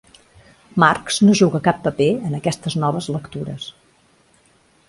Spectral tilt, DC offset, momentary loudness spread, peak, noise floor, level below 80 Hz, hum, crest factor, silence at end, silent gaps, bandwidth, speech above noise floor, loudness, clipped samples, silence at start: -5.5 dB/octave; under 0.1%; 15 LU; 0 dBFS; -57 dBFS; -54 dBFS; none; 20 dB; 1.2 s; none; 11.5 kHz; 39 dB; -18 LUFS; under 0.1%; 0.75 s